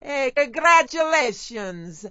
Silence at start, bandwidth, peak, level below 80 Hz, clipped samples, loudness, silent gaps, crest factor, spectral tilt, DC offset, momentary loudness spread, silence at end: 0.05 s; 8 kHz; -4 dBFS; -56 dBFS; under 0.1%; -19 LUFS; none; 18 dB; -2.5 dB/octave; under 0.1%; 17 LU; 0 s